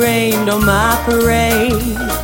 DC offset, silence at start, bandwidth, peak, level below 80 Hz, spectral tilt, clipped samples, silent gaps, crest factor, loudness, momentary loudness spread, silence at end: under 0.1%; 0 s; 17 kHz; 0 dBFS; -26 dBFS; -4.5 dB/octave; under 0.1%; none; 12 dB; -13 LUFS; 4 LU; 0 s